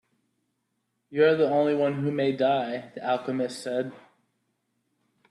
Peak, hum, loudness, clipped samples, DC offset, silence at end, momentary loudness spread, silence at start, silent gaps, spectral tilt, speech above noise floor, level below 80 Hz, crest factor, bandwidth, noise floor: -10 dBFS; none; -26 LUFS; under 0.1%; under 0.1%; 1.3 s; 11 LU; 1.1 s; none; -6.5 dB/octave; 52 dB; -74 dBFS; 18 dB; 12 kHz; -77 dBFS